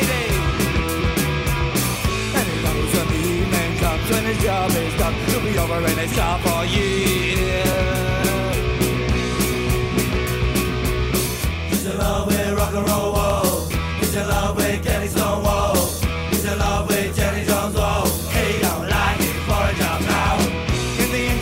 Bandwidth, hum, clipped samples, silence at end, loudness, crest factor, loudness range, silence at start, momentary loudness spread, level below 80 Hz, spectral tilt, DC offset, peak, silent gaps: 16.5 kHz; none; under 0.1%; 0 s; -20 LUFS; 14 dB; 1 LU; 0 s; 3 LU; -28 dBFS; -4.5 dB/octave; under 0.1%; -6 dBFS; none